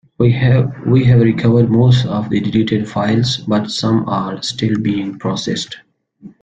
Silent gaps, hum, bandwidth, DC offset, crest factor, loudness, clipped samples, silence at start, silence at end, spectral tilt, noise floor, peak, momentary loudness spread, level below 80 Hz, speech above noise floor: none; none; 8.8 kHz; under 0.1%; 14 dB; -15 LUFS; under 0.1%; 0.2 s; 0.15 s; -7 dB/octave; -41 dBFS; -2 dBFS; 9 LU; -44 dBFS; 27 dB